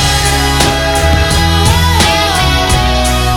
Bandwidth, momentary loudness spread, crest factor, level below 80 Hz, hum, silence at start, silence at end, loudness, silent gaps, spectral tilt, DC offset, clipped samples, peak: 18.5 kHz; 2 LU; 10 dB; -16 dBFS; none; 0 s; 0 s; -10 LUFS; none; -3.5 dB/octave; under 0.1%; under 0.1%; 0 dBFS